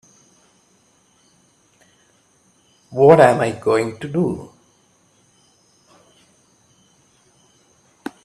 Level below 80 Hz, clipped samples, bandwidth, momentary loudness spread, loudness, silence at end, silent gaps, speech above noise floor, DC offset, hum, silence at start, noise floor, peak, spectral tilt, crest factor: -60 dBFS; under 0.1%; 12.5 kHz; 22 LU; -16 LUFS; 3.8 s; none; 43 dB; under 0.1%; none; 2.9 s; -58 dBFS; 0 dBFS; -7 dB/octave; 22 dB